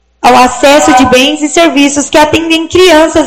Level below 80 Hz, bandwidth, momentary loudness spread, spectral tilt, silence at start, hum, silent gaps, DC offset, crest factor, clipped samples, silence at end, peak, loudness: -32 dBFS; 17.5 kHz; 4 LU; -3 dB/octave; 0.25 s; none; none; under 0.1%; 6 dB; 7%; 0 s; 0 dBFS; -5 LUFS